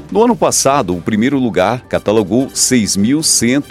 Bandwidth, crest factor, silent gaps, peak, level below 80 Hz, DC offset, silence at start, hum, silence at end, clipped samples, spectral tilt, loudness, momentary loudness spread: 16 kHz; 14 dB; none; 0 dBFS; -44 dBFS; under 0.1%; 0 s; none; 0 s; under 0.1%; -3.5 dB/octave; -13 LUFS; 5 LU